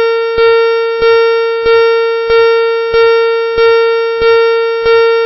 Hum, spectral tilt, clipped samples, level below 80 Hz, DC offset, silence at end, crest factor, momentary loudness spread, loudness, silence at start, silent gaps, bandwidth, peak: none; -6.5 dB/octave; under 0.1%; -40 dBFS; under 0.1%; 0 s; 6 dB; 3 LU; -9 LUFS; 0 s; none; 5.8 kHz; -2 dBFS